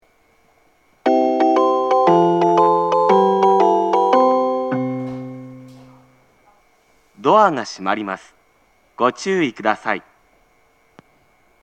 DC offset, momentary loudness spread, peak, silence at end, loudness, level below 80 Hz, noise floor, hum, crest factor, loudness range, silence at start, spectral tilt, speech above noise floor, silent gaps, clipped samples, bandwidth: under 0.1%; 13 LU; 0 dBFS; 1.65 s; -17 LUFS; -66 dBFS; -58 dBFS; none; 18 dB; 9 LU; 1.05 s; -6 dB/octave; 37 dB; none; under 0.1%; 8.8 kHz